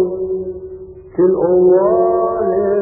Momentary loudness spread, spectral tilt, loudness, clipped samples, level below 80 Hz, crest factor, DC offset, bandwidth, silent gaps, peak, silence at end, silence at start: 18 LU; -16 dB/octave; -14 LUFS; under 0.1%; -46 dBFS; 12 dB; under 0.1%; 2 kHz; none; -2 dBFS; 0 s; 0 s